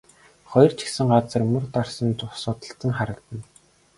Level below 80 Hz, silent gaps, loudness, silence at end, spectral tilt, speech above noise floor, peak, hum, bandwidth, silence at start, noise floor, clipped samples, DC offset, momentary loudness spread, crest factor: -54 dBFS; none; -23 LUFS; 0.55 s; -6.5 dB/octave; 24 dB; -2 dBFS; none; 11.5 kHz; 0.5 s; -46 dBFS; under 0.1%; under 0.1%; 13 LU; 22 dB